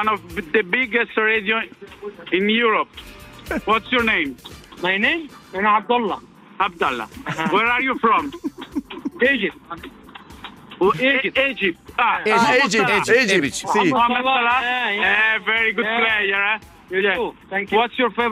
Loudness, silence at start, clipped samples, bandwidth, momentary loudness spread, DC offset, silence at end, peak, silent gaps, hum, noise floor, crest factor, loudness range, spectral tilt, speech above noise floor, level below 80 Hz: -19 LUFS; 0 s; under 0.1%; 15.5 kHz; 16 LU; under 0.1%; 0 s; -4 dBFS; none; none; -40 dBFS; 16 dB; 5 LU; -3.5 dB/octave; 20 dB; -52 dBFS